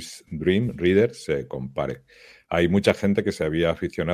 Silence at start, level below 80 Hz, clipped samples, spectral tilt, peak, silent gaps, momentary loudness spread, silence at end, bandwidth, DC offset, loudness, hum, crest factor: 0 s; -44 dBFS; under 0.1%; -6.5 dB/octave; -4 dBFS; none; 11 LU; 0 s; 15 kHz; under 0.1%; -23 LUFS; none; 20 dB